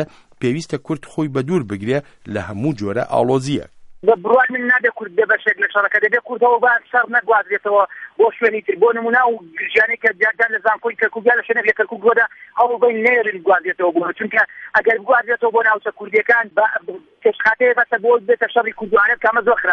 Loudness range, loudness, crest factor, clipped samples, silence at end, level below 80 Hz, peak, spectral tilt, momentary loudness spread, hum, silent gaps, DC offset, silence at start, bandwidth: 3 LU; -16 LUFS; 16 dB; under 0.1%; 0 s; -58 dBFS; -2 dBFS; -6 dB/octave; 8 LU; none; none; under 0.1%; 0 s; 10.5 kHz